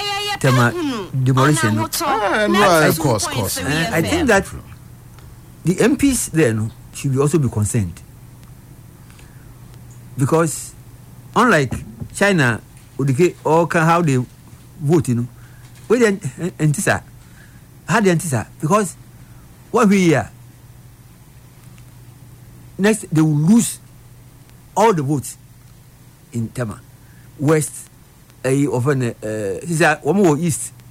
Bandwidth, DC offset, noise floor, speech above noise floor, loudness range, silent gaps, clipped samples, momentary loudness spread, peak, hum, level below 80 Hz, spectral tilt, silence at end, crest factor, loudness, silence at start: 16.5 kHz; under 0.1%; -46 dBFS; 29 dB; 7 LU; none; under 0.1%; 13 LU; -4 dBFS; none; -46 dBFS; -5.5 dB/octave; 0.2 s; 14 dB; -17 LUFS; 0 s